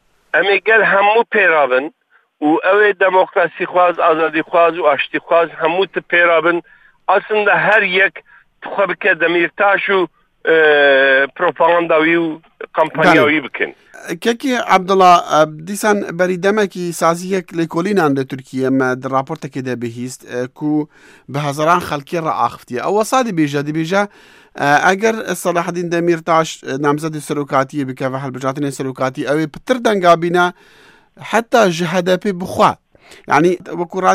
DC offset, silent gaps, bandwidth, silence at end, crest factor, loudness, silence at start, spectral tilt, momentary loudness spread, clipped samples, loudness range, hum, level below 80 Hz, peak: under 0.1%; none; 16 kHz; 0 s; 16 dB; -15 LUFS; 0.35 s; -5 dB/octave; 11 LU; under 0.1%; 6 LU; none; -58 dBFS; 0 dBFS